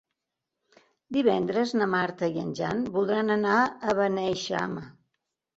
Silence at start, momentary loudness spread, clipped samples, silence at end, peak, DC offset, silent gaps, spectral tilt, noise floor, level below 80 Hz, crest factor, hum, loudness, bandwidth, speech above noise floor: 1.1 s; 7 LU; under 0.1%; 0.65 s; -10 dBFS; under 0.1%; none; -5.5 dB/octave; -85 dBFS; -64 dBFS; 18 dB; none; -27 LUFS; 8 kHz; 59 dB